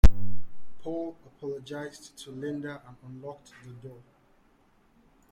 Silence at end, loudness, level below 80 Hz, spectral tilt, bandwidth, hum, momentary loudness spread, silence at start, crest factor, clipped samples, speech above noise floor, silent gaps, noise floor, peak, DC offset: 1.45 s; -37 LUFS; -32 dBFS; -7 dB/octave; 16.5 kHz; none; 13 LU; 0.05 s; 22 dB; under 0.1%; 25 dB; none; -63 dBFS; -2 dBFS; under 0.1%